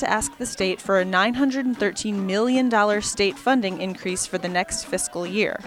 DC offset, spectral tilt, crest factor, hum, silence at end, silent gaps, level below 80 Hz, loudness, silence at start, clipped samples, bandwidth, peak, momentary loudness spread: under 0.1%; -3.5 dB/octave; 18 dB; none; 0 s; none; -52 dBFS; -23 LUFS; 0 s; under 0.1%; 16 kHz; -6 dBFS; 7 LU